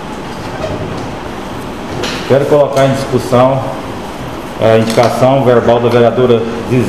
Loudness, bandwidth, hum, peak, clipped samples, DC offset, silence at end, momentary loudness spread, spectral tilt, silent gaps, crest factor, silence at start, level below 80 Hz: -11 LUFS; 14.5 kHz; none; 0 dBFS; 0.3%; 2%; 0 s; 14 LU; -6.5 dB/octave; none; 12 dB; 0 s; -36 dBFS